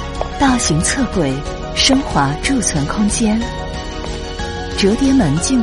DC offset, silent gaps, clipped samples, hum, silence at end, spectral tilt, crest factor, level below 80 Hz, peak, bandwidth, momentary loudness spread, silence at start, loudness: under 0.1%; none; under 0.1%; none; 0 s; -4 dB/octave; 16 dB; -28 dBFS; 0 dBFS; 11.5 kHz; 12 LU; 0 s; -16 LUFS